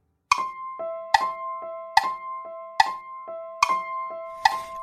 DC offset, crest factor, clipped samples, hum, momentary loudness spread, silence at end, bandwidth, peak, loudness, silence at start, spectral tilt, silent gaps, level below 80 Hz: under 0.1%; 26 dB; under 0.1%; none; 13 LU; 0 s; 15 kHz; 0 dBFS; -26 LUFS; 0.3 s; 0 dB/octave; none; -60 dBFS